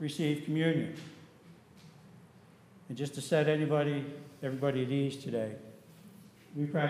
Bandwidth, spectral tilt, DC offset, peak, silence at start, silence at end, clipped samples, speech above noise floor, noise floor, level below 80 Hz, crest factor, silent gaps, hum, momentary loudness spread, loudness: 14.5 kHz; -6.5 dB/octave; under 0.1%; -16 dBFS; 0 s; 0 s; under 0.1%; 26 dB; -58 dBFS; -80 dBFS; 18 dB; none; none; 21 LU; -33 LUFS